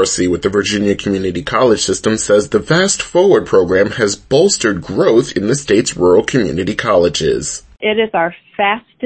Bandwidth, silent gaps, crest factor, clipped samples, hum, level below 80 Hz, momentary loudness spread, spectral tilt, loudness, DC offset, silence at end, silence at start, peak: 8.8 kHz; none; 14 dB; under 0.1%; none; -42 dBFS; 6 LU; -4 dB/octave; -14 LUFS; under 0.1%; 0 s; 0 s; 0 dBFS